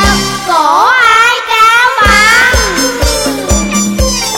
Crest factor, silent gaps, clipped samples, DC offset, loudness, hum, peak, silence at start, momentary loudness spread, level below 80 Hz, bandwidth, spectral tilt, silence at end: 8 dB; none; 0.5%; under 0.1%; -7 LUFS; none; 0 dBFS; 0 s; 7 LU; -20 dBFS; 17 kHz; -2.5 dB/octave; 0 s